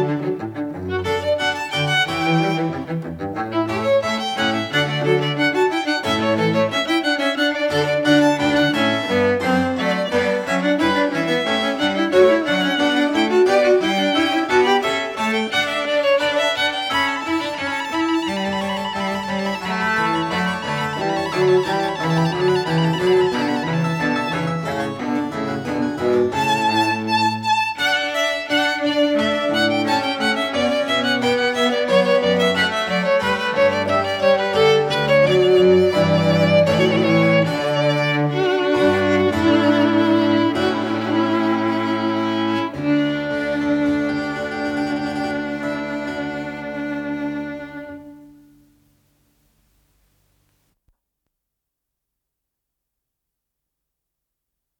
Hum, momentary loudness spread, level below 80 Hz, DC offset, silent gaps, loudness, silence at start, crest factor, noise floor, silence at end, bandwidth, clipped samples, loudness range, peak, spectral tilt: none; 8 LU; -56 dBFS; under 0.1%; none; -19 LUFS; 0 s; 16 dB; -81 dBFS; 6.5 s; 17 kHz; under 0.1%; 6 LU; -2 dBFS; -5.5 dB/octave